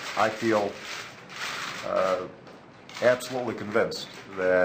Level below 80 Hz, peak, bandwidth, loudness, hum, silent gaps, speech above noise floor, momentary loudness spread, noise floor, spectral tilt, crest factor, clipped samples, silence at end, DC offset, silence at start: -68 dBFS; -10 dBFS; 16 kHz; -28 LUFS; none; none; 21 dB; 16 LU; -48 dBFS; -4 dB/octave; 18 dB; under 0.1%; 0 s; under 0.1%; 0 s